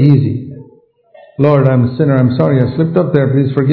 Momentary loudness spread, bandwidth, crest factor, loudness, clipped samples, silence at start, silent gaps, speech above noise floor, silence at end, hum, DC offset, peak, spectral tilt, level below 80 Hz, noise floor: 9 LU; 4.5 kHz; 12 dB; -12 LUFS; 0.5%; 0 s; none; 36 dB; 0 s; none; under 0.1%; 0 dBFS; -12 dB/octave; -50 dBFS; -46 dBFS